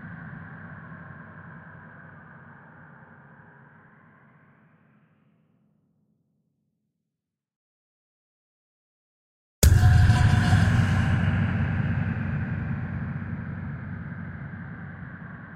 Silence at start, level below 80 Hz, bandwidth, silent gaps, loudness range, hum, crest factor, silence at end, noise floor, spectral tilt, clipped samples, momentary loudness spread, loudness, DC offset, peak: 0 s; -36 dBFS; 16 kHz; 7.56-9.62 s; 23 LU; none; 24 dB; 0 s; -86 dBFS; -6 dB/octave; under 0.1%; 26 LU; -24 LUFS; under 0.1%; -4 dBFS